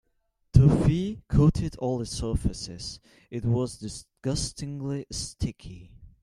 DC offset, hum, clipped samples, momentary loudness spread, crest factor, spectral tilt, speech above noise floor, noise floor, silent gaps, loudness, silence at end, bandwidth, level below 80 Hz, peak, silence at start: under 0.1%; none; under 0.1%; 18 LU; 24 dB; -6.5 dB/octave; 44 dB; -73 dBFS; none; -27 LUFS; 0.15 s; 11.5 kHz; -38 dBFS; -2 dBFS; 0.55 s